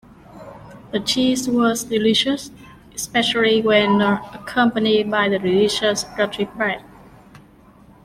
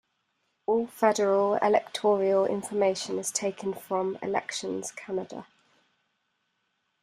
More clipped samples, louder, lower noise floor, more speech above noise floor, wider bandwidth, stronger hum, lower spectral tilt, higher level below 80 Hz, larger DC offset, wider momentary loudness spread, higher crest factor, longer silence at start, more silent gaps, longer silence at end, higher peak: neither; first, -19 LUFS vs -27 LUFS; second, -48 dBFS vs -77 dBFS; second, 29 dB vs 50 dB; about the same, 15.5 kHz vs 15.5 kHz; neither; about the same, -4 dB/octave vs -4 dB/octave; first, -52 dBFS vs -74 dBFS; neither; about the same, 13 LU vs 11 LU; about the same, 16 dB vs 20 dB; second, 0.3 s vs 0.7 s; neither; second, 1.25 s vs 1.6 s; first, -4 dBFS vs -8 dBFS